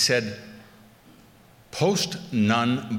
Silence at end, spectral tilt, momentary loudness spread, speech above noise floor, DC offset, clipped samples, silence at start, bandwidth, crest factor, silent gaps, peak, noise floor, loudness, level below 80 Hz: 0 s; -4 dB/octave; 17 LU; 29 dB; under 0.1%; under 0.1%; 0 s; 17 kHz; 18 dB; none; -8 dBFS; -53 dBFS; -24 LUFS; -64 dBFS